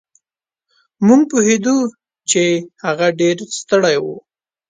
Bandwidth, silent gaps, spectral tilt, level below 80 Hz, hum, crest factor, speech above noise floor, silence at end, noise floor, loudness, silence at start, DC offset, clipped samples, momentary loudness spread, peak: 9.6 kHz; none; -4 dB/octave; -64 dBFS; none; 16 dB; 71 dB; 0.5 s; -86 dBFS; -15 LUFS; 1 s; under 0.1%; under 0.1%; 12 LU; 0 dBFS